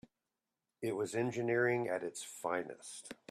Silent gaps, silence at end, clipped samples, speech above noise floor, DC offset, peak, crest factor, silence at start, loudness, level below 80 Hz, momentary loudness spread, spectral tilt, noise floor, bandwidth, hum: none; 0.15 s; under 0.1%; 53 dB; under 0.1%; -20 dBFS; 18 dB; 0.8 s; -37 LUFS; -80 dBFS; 15 LU; -5 dB/octave; -90 dBFS; 14 kHz; none